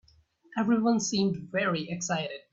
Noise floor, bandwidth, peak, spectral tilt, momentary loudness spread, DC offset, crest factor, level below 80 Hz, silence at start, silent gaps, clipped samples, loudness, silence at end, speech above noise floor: -63 dBFS; 7.8 kHz; -14 dBFS; -4.5 dB/octave; 7 LU; under 0.1%; 16 dB; -66 dBFS; 0.5 s; none; under 0.1%; -28 LUFS; 0.15 s; 35 dB